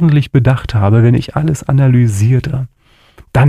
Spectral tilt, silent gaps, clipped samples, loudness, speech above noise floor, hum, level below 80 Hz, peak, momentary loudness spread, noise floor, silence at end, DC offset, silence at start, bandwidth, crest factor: -8 dB/octave; none; under 0.1%; -12 LUFS; 33 dB; none; -34 dBFS; 0 dBFS; 9 LU; -44 dBFS; 0 s; under 0.1%; 0 s; 12 kHz; 10 dB